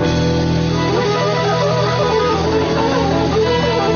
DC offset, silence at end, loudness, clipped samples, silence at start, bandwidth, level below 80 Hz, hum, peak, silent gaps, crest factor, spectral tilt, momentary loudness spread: under 0.1%; 0 s; -16 LUFS; under 0.1%; 0 s; 7 kHz; -36 dBFS; none; -4 dBFS; none; 10 dB; -5 dB/octave; 1 LU